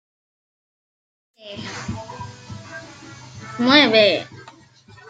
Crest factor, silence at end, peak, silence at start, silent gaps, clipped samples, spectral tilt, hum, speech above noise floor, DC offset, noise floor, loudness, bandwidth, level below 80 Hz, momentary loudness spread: 22 dB; 0.7 s; -2 dBFS; 1.45 s; none; under 0.1%; -4.5 dB/octave; none; 30 dB; under 0.1%; -48 dBFS; -16 LUFS; 9.2 kHz; -58 dBFS; 25 LU